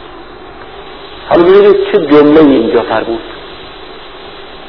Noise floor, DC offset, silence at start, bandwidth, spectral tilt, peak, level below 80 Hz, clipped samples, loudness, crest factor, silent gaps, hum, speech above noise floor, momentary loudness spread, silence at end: -30 dBFS; 1%; 0 s; 5.4 kHz; -8.5 dB/octave; 0 dBFS; -40 dBFS; 1%; -8 LUFS; 10 dB; none; none; 23 dB; 24 LU; 0 s